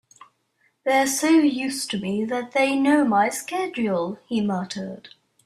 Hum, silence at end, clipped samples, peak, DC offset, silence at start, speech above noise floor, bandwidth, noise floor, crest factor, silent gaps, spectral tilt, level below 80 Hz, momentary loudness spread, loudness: none; 0.4 s; under 0.1%; -8 dBFS; under 0.1%; 0.85 s; 45 dB; 14.5 kHz; -67 dBFS; 16 dB; none; -4 dB/octave; -68 dBFS; 11 LU; -22 LUFS